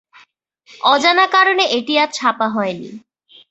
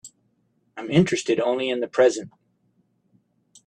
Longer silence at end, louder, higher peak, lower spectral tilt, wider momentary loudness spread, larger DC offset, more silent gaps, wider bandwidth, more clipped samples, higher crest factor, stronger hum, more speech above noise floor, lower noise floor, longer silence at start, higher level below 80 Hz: second, 0.55 s vs 1.4 s; first, -15 LUFS vs -22 LUFS; about the same, -2 dBFS vs -4 dBFS; second, -2.5 dB/octave vs -5.5 dB/octave; second, 11 LU vs 19 LU; neither; neither; second, 8.2 kHz vs 10.5 kHz; neither; about the same, 16 dB vs 20 dB; neither; second, 37 dB vs 47 dB; second, -53 dBFS vs -68 dBFS; first, 0.85 s vs 0.05 s; about the same, -68 dBFS vs -64 dBFS